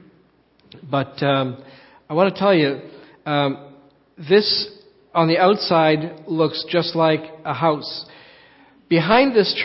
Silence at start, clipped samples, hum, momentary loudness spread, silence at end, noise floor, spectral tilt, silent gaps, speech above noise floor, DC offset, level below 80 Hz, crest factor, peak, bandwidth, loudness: 0.85 s; under 0.1%; none; 14 LU; 0 s; -57 dBFS; -9.5 dB/octave; none; 39 dB; under 0.1%; -62 dBFS; 20 dB; 0 dBFS; 5.8 kHz; -19 LUFS